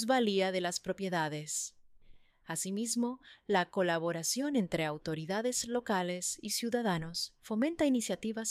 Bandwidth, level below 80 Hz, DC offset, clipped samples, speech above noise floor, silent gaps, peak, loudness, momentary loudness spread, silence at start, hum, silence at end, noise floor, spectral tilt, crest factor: 15.5 kHz; -66 dBFS; under 0.1%; under 0.1%; 24 dB; none; -16 dBFS; -34 LUFS; 7 LU; 0 s; none; 0 s; -58 dBFS; -3.5 dB/octave; 16 dB